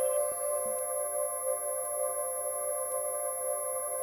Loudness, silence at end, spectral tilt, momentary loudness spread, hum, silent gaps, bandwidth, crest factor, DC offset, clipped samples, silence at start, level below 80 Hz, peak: -32 LUFS; 0 s; -1 dB/octave; 2 LU; none; none; 17.5 kHz; 14 dB; under 0.1%; under 0.1%; 0 s; -72 dBFS; -20 dBFS